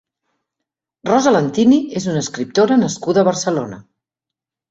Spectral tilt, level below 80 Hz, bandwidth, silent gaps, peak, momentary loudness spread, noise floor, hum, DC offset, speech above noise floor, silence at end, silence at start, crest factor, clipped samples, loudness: -5.5 dB/octave; -58 dBFS; 8 kHz; none; -2 dBFS; 8 LU; -86 dBFS; none; under 0.1%; 70 dB; 0.9 s; 1.05 s; 16 dB; under 0.1%; -16 LUFS